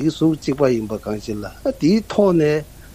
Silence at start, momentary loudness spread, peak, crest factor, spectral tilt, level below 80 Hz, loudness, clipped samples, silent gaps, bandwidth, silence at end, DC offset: 0 s; 11 LU; -2 dBFS; 16 dB; -7 dB/octave; -44 dBFS; -19 LUFS; under 0.1%; none; 15.5 kHz; 0.15 s; under 0.1%